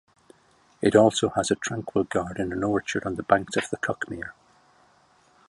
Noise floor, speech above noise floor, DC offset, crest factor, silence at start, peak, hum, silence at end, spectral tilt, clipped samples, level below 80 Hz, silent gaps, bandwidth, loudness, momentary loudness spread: -61 dBFS; 36 dB; under 0.1%; 22 dB; 0.8 s; -4 dBFS; none; 1.2 s; -4.5 dB/octave; under 0.1%; -54 dBFS; none; 11.5 kHz; -25 LUFS; 12 LU